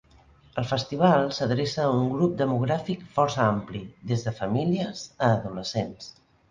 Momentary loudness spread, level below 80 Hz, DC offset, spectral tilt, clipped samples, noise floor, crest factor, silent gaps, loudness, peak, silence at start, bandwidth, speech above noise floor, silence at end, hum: 11 LU; -56 dBFS; under 0.1%; -6.5 dB/octave; under 0.1%; -56 dBFS; 20 dB; none; -26 LUFS; -6 dBFS; 0.55 s; 9.4 kHz; 31 dB; 0.4 s; none